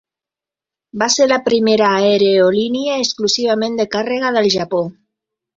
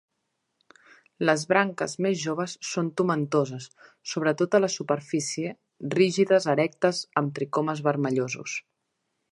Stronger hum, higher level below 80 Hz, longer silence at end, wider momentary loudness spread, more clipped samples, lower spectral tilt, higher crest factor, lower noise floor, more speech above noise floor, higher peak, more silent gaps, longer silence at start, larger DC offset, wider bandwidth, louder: neither; first, -60 dBFS vs -76 dBFS; about the same, 0.65 s vs 0.7 s; second, 8 LU vs 11 LU; neither; second, -3.5 dB/octave vs -5 dB/octave; second, 16 dB vs 22 dB; first, -88 dBFS vs -79 dBFS; first, 73 dB vs 53 dB; first, -2 dBFS vs -6 dBFS; neither; second, 0.95 s vs 1.2 s; neither; second, 7.8 kHz vs 11.5 kHz; first, -15 LUFS vs -26 LUFS